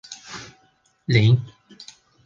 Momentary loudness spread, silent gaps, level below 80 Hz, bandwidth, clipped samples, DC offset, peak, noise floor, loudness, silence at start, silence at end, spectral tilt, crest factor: 26 LU; none; -54 dBFS; 7.6 kHz; under 0.1%; under 0.1%; -4 dBFS; -62 dBFS; -19 LUFS; 0.1 s; 0.4 s; -6 dB/octave; 20 dB